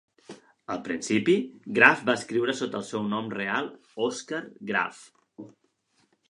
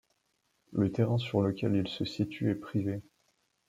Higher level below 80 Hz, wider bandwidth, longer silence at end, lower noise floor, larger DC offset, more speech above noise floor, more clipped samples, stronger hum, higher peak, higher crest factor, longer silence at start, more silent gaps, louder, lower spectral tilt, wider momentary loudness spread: second, -72 dBFS vs -66 dBFS; first, 11.5 kHz vs 9.6 kHz; first, 0.85 s vs 0.65 s; second, -70 dBFS vs -76 dBFS; neither; about the same, 43 dB vs 46 dB; neither; neither; first, -2 dBFS vs -14 dBFS; first, 26 dB vs 18 dB; second, 0.3 s vs 0.7 s; neither; first, -26 LUFS vs -32 LUFS; second, -4.5 dB/octave vs -8 dB/octave; first, 16 LU vs 7 LU